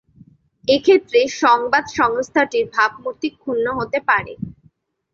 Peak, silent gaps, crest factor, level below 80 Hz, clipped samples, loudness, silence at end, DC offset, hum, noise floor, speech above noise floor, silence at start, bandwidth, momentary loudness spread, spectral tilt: -2 dBFS; none; 16 dB; -54 dBFS; under 0.1%; -18 LUFS; 0.65 s; under 0.1%; none; -57 dBFS; 39 dB; 0.7 s; 7.6 kHz; 12 LU; -4 dB/octave